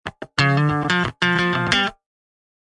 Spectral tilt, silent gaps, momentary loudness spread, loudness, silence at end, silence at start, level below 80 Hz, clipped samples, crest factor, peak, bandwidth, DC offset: -5 dB/octave; none; 4 LU; -19 LUFS; 0.75 s; 0.05 s; -50 dBFS; under 0.1%; 20 dB; -2 dBFS; 11 kHz; under 0.1%